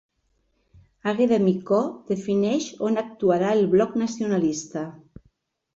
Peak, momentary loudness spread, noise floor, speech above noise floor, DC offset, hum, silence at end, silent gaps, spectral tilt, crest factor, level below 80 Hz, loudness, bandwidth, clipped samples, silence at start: -8 dBFS; 10 LU; -70 dBFS; 48 dB; under 0.1%; none; 0.75 s; none; -6 dB/octave; 16 dB; -62 dBFS; -23 LUFS; 8 kHz; under 0.1%; 1.05 s